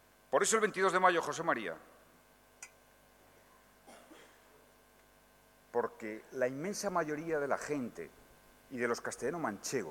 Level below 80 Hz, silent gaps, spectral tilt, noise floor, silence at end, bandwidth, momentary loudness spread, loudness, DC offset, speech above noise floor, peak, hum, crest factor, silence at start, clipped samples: -72 dBFS; none; -3.5 dB/octave; -65 dBFS; 0 s; 17 kHz; 22 LU; -34 LUFS; under 0.1%; 30 dB; -14 dBFS; 50 Hz at -75 dBFS; 24 dB; 0.3 s; under 0.1%